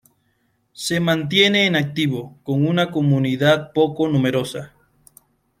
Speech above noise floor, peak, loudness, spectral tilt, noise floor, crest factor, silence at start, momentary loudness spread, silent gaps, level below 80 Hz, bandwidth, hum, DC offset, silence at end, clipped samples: 47 dB; -2 dBFS; -19 LUFS; -5.5 dB/octave; -66 dBFS; 18 dB; 0.8 s; 10 LU; none; -60 dBFS; 15 kHz; none; under 0.1%; 0.95 s; under 0.1%